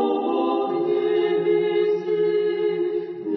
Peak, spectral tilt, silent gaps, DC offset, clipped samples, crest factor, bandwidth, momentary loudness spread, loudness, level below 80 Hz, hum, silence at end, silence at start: -10 dBFS; -8 dB/octave; none; under 0.1%; under 0.1%; 10 dB; 5.6 kHz; 3 LU; -22 LUFS; -74 dBFS; none; 0 s; 0 s